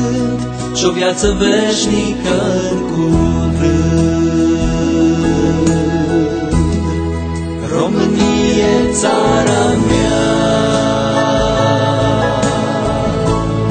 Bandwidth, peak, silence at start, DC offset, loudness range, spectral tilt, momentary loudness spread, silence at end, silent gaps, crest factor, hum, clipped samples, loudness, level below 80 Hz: 9.2 kHz; 0 dBFS; 0 s; 0.1%; 2 LU; -5.5 dB/octave; 4 LU; 0 s; none; 12 dB; none; under 0.1%; -14 LUFS; -26 dBFS